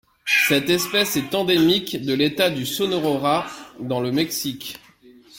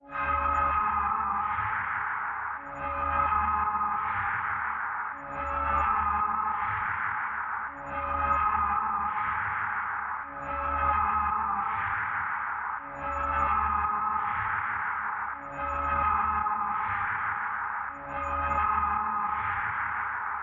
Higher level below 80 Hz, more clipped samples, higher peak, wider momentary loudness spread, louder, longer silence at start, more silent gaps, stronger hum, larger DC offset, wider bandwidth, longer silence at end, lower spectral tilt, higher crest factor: second, -58 dBFS vs -48 dBFS; neither; first, -6 dBFS vs -14 dBFS; first, 13 LU vs 8 LU; first, -20 LUFS vs -29 LUFS; first, 0.25 s vs 0.05 s; neither; neither; neither; first, 17 kHz vs 7.2 kHz; about the same, 0 s vs 0 s; about the same, -3.5 dB/octave vs -3.5 dB/octave; about the same, 16 dB vs 16 dB